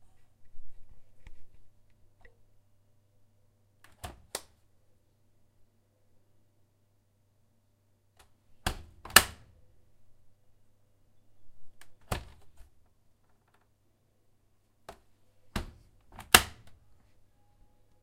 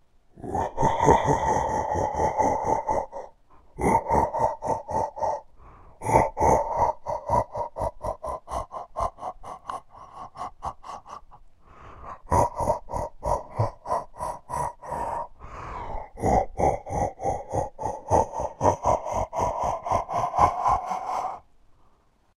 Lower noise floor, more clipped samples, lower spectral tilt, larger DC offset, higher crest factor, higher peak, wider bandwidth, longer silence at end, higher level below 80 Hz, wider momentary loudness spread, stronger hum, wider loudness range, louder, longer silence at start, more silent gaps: first, -70 dBFS vs -61 dBFS; neither; second, -1 dB/octave vs -6 dB/octave; neither; first, 38 dB vs 24 dB; about the same, 0 dBFS vs -2 dBFS; first, 16 kHz vs 14 kHz; first, 1.3 s vs 1 s; second, -52 dBFS vs -42 dBFS; first, 26 LU vs 16 LU; neither; first, 19 LU vs 9 LU; about the same, -27 LUFS vs -26 LUFS; second, 0 s vs 0.35 s; neither